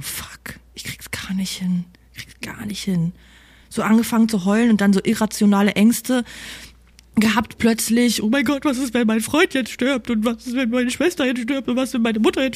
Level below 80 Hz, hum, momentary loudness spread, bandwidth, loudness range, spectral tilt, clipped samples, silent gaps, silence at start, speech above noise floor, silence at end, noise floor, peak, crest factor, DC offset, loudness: -50 dBFS; none; 16 LU; 15.5 kHz; 7 LU; -5 dB/octave; under 0.1%; none; 0 s; 29 dB; 0 s; -48 dBFS; -4 dBFS; 16 dB; under 0.1%; -19 LUFS